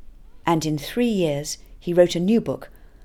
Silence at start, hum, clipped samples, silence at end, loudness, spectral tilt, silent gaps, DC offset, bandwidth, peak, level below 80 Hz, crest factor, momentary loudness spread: 0 s; none; under 0.1%; 0 s; -22 LUFS; -5.5 dB/octave; none; under 0.1%; 17.5 kHz; -4 dBFS; -46 dBFS; 20 dB; 13 LU